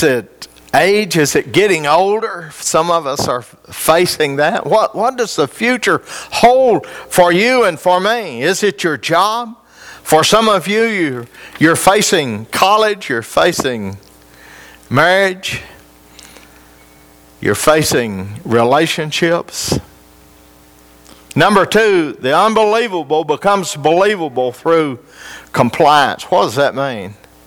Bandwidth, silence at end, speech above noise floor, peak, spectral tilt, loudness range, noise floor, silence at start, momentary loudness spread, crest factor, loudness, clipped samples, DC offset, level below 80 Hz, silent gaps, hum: over 20 kHz; 0.3 s; 31 dB; 0 dBFS; -4 dB/octave; 4 LU; -44 dBFS; 0 s; 11 LU; 14 dB; -13 LUFS; under 0.1%; under 0.1%; -48 dBFS; none; none